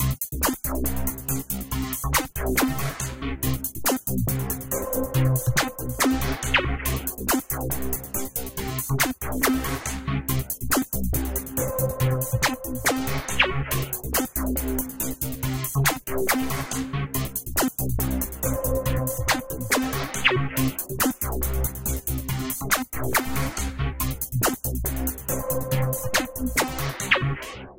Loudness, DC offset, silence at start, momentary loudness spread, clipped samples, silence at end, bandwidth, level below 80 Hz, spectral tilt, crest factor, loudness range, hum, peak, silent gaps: -25 LUFS; under 0.1%; 0 s; 6 LU; under 0.1%; 0 s; 17.5 kHz; -34 dBFS; -4 dB/octave; 22 dB; 2 LU; none; -2 dBFS; none